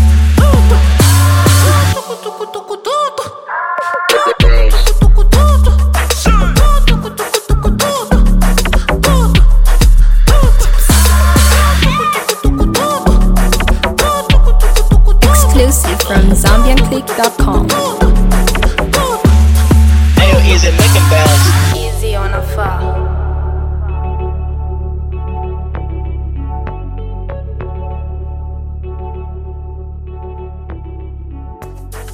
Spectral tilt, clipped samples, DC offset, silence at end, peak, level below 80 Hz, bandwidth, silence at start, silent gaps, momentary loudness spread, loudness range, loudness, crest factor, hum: -5 dB/octave; under 0.1%; under 0.1%; 0 s; 0 dBFS; -10 dBFS; 17 kHz; 0 s; none; 16 LU; 14 LU; -11 LUFS; 10 dB; none